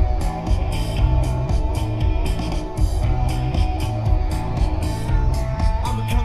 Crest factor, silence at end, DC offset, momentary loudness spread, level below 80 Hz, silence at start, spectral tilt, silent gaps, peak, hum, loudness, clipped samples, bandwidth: 14 dB; 0 s; under 0.1%; 3 LU; -22 dBFS; 0 s; -6.5 dB/octave; none; -4 dBFS; none; -22 LUFS; under 0.1%; 13 kHz